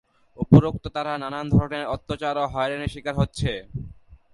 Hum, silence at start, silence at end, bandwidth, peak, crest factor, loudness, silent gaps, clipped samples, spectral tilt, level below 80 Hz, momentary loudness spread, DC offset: none; 0.4 s; 0.2 s; 11.5 kHz; 0 dBFS; 22 dB; -24 LUFS; none; under 0.1%; -7.5 dB/octave; -40 dBFS; 16 LU; under 0.1%